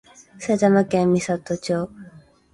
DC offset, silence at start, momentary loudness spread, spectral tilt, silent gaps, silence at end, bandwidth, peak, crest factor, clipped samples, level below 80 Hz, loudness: under 0.1%; 0.4 s; 11 LU; -6.5 dB/octave; none; 0.35 s; 11.5 kHz; -4 dBFS; 18 dB; under 0.1%; -56 dBFS; -21 LUFS